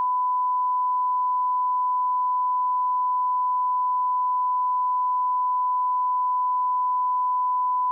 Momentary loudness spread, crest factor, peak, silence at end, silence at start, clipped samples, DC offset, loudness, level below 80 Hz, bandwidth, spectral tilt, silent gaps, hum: 0 LU; 4 dB; -20 dBFS; 0 s; 0 s; under 0.1%; under 0.1%; -23 LUFS; under -90 dBFS; 1.1 kHz; 8.5 dB/octave; none; none